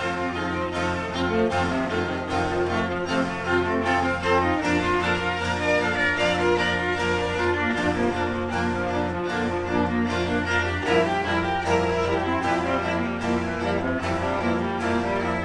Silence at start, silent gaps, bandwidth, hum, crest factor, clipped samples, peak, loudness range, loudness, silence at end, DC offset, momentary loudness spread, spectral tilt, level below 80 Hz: 0 s; none; 10.5 kHz; none; 16 dB; under 0.1%; -8 dBFS; 2 LU; -24 LUFS; 0 s; 0.2%; 4 LU; -5.5 dB/octave; -44 dBFS